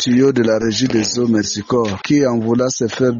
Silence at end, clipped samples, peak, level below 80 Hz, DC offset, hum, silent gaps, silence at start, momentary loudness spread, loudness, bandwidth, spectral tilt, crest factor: 0 s; under 0.1%; -2 dBFS; -50 dBFS; under 0.1%; none; none; 0 s; 4 LU; -16 LUFS; 7.6 kHz; -5 dB/octave; 12 dB